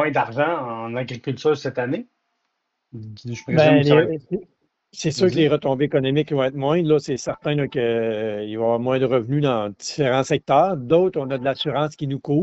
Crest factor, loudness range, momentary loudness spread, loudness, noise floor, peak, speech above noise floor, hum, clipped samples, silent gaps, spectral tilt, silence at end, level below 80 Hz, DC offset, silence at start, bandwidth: 18 dB; 3 LU; 11 LU; -21 LUFS; -75 dBFS; -2 dBFS; 55 dB; none; under 0.1%; none; -5.5 dB/octave; 0 s; -58 dBFS; under 0.1%; 0 s; 8 kHz